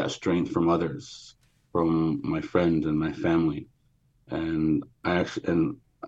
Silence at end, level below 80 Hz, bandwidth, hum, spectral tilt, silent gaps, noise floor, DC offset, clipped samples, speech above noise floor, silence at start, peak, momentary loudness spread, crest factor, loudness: 0 s; -56 dBFS; 7.8 kHz; none; -7 dB/octave; none; -66 dBFS; under 0.1%; under 0.1%; 40 dB; 0 s; -10 dBFS; 8 LU; 18 dB; -27 LUFS